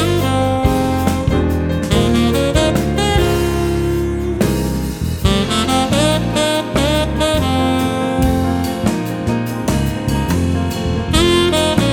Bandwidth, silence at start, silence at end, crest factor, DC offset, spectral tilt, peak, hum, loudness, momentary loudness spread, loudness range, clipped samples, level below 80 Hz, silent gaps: 18.5 kHz; 0 s; 0 s; 14 dB; under 0.1%; -5.5 dB/octave; 0 dBFS; none; -16 LUFS; 5 LU; 2 LU; under 0.1%; -26 dBFS; none